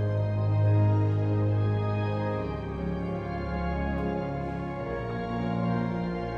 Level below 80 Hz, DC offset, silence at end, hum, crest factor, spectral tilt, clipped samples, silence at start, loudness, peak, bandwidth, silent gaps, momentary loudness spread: -42 dBFS; under 0.1%; 0 s; none; 12 dB; -10 dB/octave; under 0.1%; 0 s; -29 LUFS; -16 dBFS; 5.2 kHz; none; 9 LU